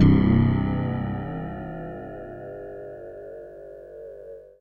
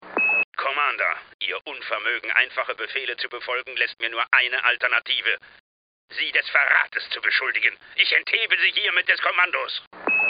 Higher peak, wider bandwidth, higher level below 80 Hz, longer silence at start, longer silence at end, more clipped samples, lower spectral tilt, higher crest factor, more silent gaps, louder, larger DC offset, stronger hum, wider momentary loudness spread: second, -6 dBFS vs -2 dBFS; second, 4.6 kHz vs 5.2 kHz; first, -38 dBFS vs -72 dBFS; about the same, 0 s vs 0 s; about the same, 0.1 s vs 0 s; neither; first, -10.5 dB/octave vs 4 dB/octave; about the same, 20 dB vs 22 dB; second, none vs 0.44-0.52 s, 1.34-1.39 s, 5.60-6.08 s, 9.87-9.91 s; second, -25 LUFS vs -21 LUFS; neither; first, 50 Hz at -50 dBFS vs none; first, 22 LU vs 10 LU